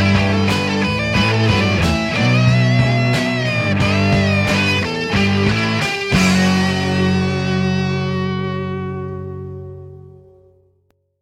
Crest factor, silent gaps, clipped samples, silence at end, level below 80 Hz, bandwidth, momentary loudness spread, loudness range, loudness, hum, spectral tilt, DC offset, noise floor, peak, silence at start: 14 dB; none; under 0.1%; 1.1 s; -36 dBFS; 14 kHz; 11 LU; 7 LU; -16 LUFS; none; -5.5 dB/octave; under 0.1%; -62 dBFS; -2 dBFS; 0 s